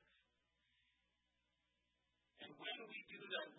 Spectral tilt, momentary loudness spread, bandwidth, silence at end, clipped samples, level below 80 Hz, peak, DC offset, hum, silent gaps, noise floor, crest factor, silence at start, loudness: 1.5 dB/octave; 12 LU; 3.9 kHz; 0 s; under 0.1%; under -90 dBFS; -32 dBFS; under 0.1%; none; none; -87 dBFS; 24 dB; 2.35 s; -51 LUFS